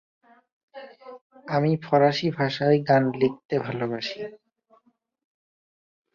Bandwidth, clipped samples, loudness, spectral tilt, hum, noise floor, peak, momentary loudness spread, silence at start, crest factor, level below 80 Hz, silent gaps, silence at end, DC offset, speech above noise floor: 7.2 kHz; under 0.1%; -24 LUFS; -7 dB/octave; none; -65 dBFS; -6 dBFS; 24 LU; 0.75 s; 20 dB; -66 dBFS; 1.21-1.30 s, 3.45-3.49 s; 1.8 s; under 0.1%; 42 dB